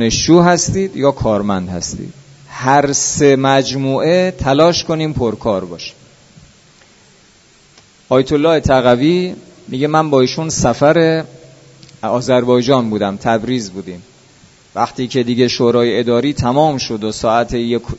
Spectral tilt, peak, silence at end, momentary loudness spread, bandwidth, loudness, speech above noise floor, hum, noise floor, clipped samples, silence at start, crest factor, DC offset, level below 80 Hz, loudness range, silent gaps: -5 dB/octave; 0 dBFS; 0 s; 13 LU; 8 kHz; -14 LUFS; 34 dB; none; -48 dBFS; under 0.1%; 0 s; 14 dB; under 0.1%; -38 dBFS; 5 LU; none